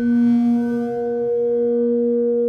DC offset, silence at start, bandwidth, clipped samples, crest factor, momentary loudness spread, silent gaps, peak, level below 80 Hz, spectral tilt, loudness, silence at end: under 0.1%; 0 s; 4.4 kHz; under 0.1%; 8 dB; 6 LU; none; -10 dBFS; -58 dBFS; -9 dB/octave; -19 LUFS; 0 s